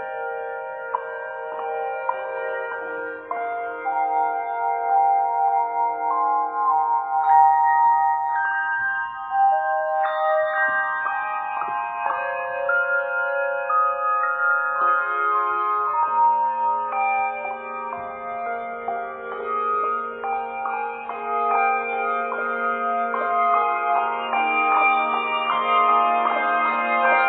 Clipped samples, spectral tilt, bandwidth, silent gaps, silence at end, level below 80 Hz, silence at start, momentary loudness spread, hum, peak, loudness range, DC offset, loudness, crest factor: under 0.1%; -6.5 dB/octave; 4.2 kHz; none; 0 s; -70 dBFS; 0 s; 11 LU; none; -6 dBFS; 7 LU; under 0.1%; -22 LUFS; 16 dB